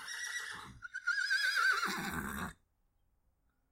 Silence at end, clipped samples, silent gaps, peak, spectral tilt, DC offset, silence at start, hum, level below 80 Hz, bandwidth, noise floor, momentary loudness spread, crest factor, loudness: 1.2 s; under 0.1%; none; -22 dBFS; -1.5 dB/octave; under 0.1%; 0 s; none; -62 dBFS; 16 kHz; -76 dBFS; 16 LU; 16 dB; -34 LUFS